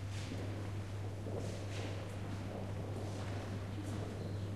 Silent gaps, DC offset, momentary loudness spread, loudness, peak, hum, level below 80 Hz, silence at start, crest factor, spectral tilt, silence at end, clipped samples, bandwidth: none; 0.1%; 1 LU; -43 LUFS; -30 dBFS; none; -56 dBFS; 0 s; 12 dB; -6.5 dB/octave; 0 s; under 0.1%; 13 kHz